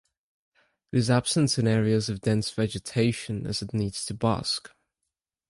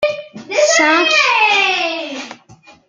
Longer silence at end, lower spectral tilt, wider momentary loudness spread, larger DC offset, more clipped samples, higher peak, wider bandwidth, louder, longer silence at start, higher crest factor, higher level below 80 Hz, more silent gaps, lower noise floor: first, 0.85 s vs 0.55 s; first, -5 dB/octave vs -0.5 dB/octave; second, 8 LU vs 17 LU; neither; neither; second, -8 dBFS vs -2 dBFS; first, 11.5 kHz vs 9.6 kHz; second, -26 LUFS vs -12 LUFS; first, 0.95 s vs 0 s; about the same, 18 dB vs 14 dB; first, -54 dBFS vs -64 dBFS; neither; first, -85 dBFS vs -45 dBFS